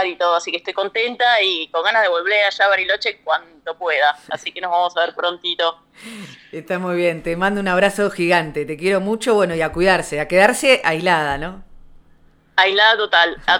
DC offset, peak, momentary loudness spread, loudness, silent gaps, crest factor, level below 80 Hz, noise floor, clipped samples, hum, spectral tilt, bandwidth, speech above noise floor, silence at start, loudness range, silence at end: under 0.1%; 0 dBFS; 12 LU; -17 LUFS; none; 18 dB; -46 dBFS; -51 dBFS; under 0.1%; none; -3.5 dB/octave; 17 kHz; 33 dB; 0 s; 5 LU; 0 s